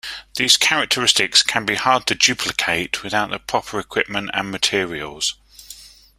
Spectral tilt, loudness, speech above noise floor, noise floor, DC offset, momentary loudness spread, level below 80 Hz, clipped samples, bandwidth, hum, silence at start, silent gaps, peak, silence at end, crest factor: -1 dB/octave; -18 LUFS; 23 dB; -43 dBFS; under 0.1%; 10 LU; -52 dBFS; under 0.1%; 16.5 kHz; none; 0.05 s; none; 0 dBFS; 0.3 s; 20 dB